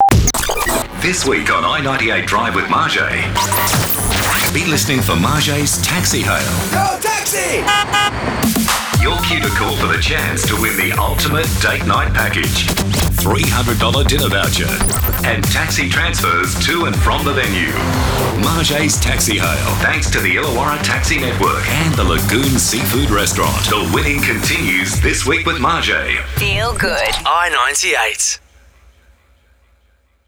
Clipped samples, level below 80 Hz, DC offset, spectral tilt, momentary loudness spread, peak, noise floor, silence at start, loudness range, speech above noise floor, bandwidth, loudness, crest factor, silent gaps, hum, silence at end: under 0.1%; -26 dBFS; under 0.1%; -3.5 dB/octave; 2 LU; -4 dBFS; -56 dBFS; 0 s; 1 LU; 41 dB; over 20 kHz; -14 LUFS; 12 dB; none; none; 1.9 s